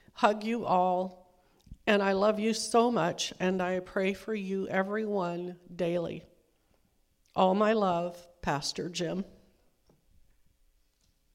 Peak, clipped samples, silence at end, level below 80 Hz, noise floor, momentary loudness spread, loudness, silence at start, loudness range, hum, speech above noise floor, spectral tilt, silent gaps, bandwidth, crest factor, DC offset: -8 dBFS; under 0.1%; 2.1 s; -62 dBFS; -70 dBFS; 12 LU; -30 LUFS; 0.15 s; 6 LU; none; 41 dB; -5 dB/octave; none; 16 kHz; 22 dB; under 0.1%